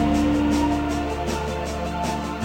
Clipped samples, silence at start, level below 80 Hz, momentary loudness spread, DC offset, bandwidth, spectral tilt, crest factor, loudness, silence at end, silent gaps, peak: under 0.1%; 0 s; -32 dBFS; 7 LU; under 0.1%; 16 kHz; -6 dB/octave; 14 dB; -24 LUFS; 0 s; none; -10 dBFS